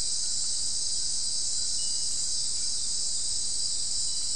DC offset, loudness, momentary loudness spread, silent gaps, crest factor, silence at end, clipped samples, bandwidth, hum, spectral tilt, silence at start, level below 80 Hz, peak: 3%; -27 LUFS; 1 LU; none; 14 dB; 0 s; under 0.1%; 12 kHz; none; 1.5 dB/octave; 0 s; -52 dBFS; -16 dBFS